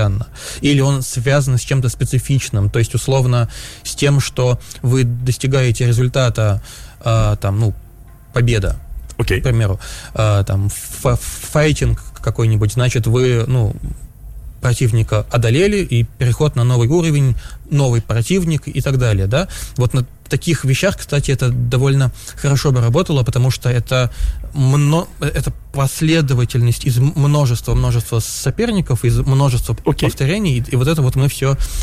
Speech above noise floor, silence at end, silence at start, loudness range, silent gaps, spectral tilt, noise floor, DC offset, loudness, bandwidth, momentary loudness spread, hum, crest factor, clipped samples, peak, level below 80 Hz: 24 dB; 0 s; 0 s; 2 LU; none; -6 dB/octave; -39 dBFS; under 0.1%; -16 LUFS; 15 kHz; 7 LU; none; 10 dB; under 0.1%; -4 dBFS; -30 dBFS